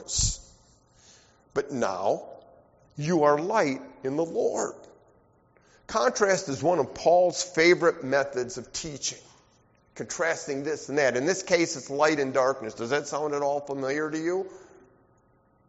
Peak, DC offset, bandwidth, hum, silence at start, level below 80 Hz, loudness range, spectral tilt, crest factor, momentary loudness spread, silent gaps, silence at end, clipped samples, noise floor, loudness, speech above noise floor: -8 dBFS; under 0.1%; 8 kHz; none; 0 s; -50 dBFS; 5 LU; -3.5 dB/octave; 20 dB; 11 LU; none; 1.05 s; under 0.1%; -64 dBFS; -26 LUFS; 38 dB